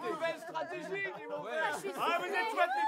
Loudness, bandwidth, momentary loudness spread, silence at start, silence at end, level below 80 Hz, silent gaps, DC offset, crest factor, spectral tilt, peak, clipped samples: -35 LUFS; 16 kHz; 8 LU; 0 s; 0 s; under -90 dBFS; none; under 0.1%; 18 dB; -3 dB/octave; -16 dBFS; under 0.1%